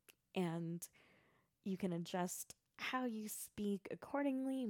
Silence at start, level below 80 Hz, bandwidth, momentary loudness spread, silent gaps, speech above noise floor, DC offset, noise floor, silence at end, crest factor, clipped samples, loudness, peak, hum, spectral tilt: 0.1 s; -82 dBFS; 18 kHz; 8 LU; none; 33 dB; under 0.1%; -76 dBFS; 0 s; 16 dB; under 0.1%; -44 LUFS; -28 dBFS; none; -5 dB/octave